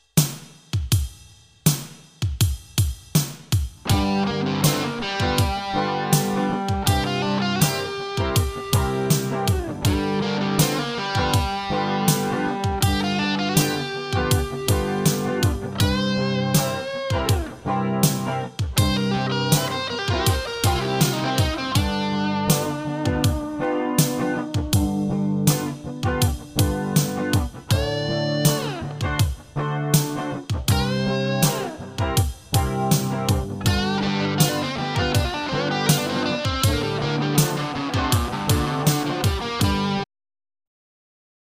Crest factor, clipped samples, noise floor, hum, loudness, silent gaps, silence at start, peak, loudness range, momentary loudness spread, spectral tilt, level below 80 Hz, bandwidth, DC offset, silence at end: 18 dB; under 0.1%; -49 dBFS; none; -22 LUFS; none; 0.15 s; -4 dBFS; 1 LU; 5 LU; -4.5 dB/octave; -34 dBFS; 15.5 kHz; under 0.1%; 1.55 s